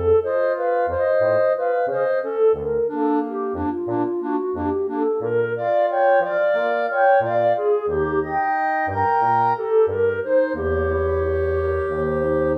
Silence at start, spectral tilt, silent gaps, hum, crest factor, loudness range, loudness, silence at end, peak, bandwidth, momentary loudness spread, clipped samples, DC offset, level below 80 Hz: 0 s; -9 dB/octave; none; none; 14 dB; 3 LU; -20 LUFS; 0 s; -6 dBFS; 5.4 kHz; 5 LU; under 0.1%; under 0.1%; -42 dBFS